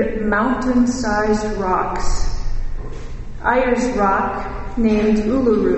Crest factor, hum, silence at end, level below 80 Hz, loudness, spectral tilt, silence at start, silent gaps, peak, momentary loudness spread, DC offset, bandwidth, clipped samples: 14 dB; none; 0 s; -26 dBFS; -18 LUFS; -6 dB/octave; 0 s; none; -4 dBFS; 14 LU; under 0.1%; 8.4 kHz; under 0.1%